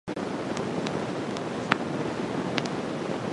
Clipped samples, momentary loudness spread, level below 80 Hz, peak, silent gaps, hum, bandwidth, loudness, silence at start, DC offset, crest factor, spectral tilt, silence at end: under 0.1%; 4 LU; -60 dBFS; 0 dBFS; none; none; 11.5 kHz; -30 LUFS; 0.05 s; under 0.1%; 30 dB; -5.5 dB/octave; 0 s